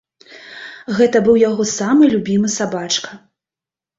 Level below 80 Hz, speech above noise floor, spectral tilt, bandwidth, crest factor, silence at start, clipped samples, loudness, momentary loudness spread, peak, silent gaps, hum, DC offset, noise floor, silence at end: -56 dBFS; 74 dB; -4.5 dB/octave; 8 kHz; 16 dB; 0.3 s; under 0.1%; -15 LUFS; 20 LU; -2 dBFS; none; none; under 0.1%; -89 dBFS; 0.8 s